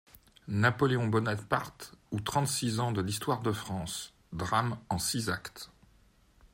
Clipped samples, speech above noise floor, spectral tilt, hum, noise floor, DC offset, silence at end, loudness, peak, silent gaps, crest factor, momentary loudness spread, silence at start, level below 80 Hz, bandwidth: under 0.1%; 32 dB; -4.5 dB/octave; none; -63 dBFS; under 0.1%; 0.1 s; -32 LUFS; -12 dBFS; none; 20 dB; 15 LU; 0.15 s; -60 dBFS; 16.5 kHz